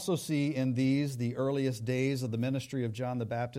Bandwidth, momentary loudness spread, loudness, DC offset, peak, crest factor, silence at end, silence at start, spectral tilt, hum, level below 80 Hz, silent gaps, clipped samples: 15.5 kHz; 5 LU; -32 LUFS; under 0.1%; -20 dBFS; 12 dB; 0 s; 0 s; -6.5 dB/octave; none; -68 dBFS; none; under 0.1%